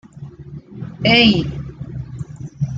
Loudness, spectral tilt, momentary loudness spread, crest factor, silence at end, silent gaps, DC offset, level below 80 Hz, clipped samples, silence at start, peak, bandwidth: -15 LUFS; -6 dB/octave; 25 LU; 18 dB; 0 s; none; under 0.1%; -42 dBFS; under 0.1%; 0.15 s; -2 dBFS; 7.6 kHz